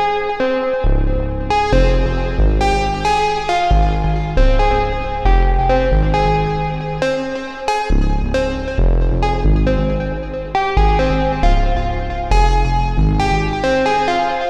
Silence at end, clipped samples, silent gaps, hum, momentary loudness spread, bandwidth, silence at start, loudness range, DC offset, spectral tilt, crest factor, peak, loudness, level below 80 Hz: 0 s; under 0.1%; none; none; 5 LU; 8.8 kHz; 0 s; 2 LU; under 0.1%; -6.5 dB/octave; 12 dB; -2 dBFS; -17 LUFS; -18 dBFS